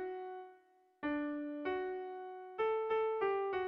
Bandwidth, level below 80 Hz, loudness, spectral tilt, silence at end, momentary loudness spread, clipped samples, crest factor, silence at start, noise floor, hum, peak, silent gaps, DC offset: 5.4 kHz; -74 dBFS; -39 LUFS; -2.5 dB/octave; 0 s; 13 LU; under 0.1%; 14 dB; 0 s; -67 dBFS; none; -26 dBFS; none; under 0.1%